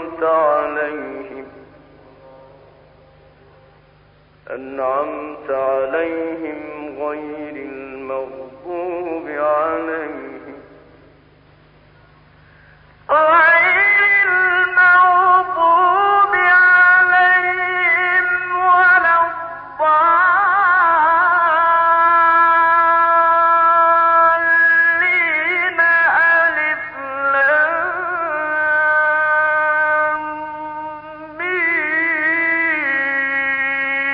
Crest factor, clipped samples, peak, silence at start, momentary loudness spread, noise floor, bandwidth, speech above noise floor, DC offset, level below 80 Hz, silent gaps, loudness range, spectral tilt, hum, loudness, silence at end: 12 dB; under 0.1%; -4 dBFS; 0 s; 17 LU; -50 dBFS; 5.4 kHz; 30 dB; under 0.1%; -56 dBFS; none; 13 LU; -8 dB/octave; 50 Hz at -55 dBFS; -14 LUFS; 0 s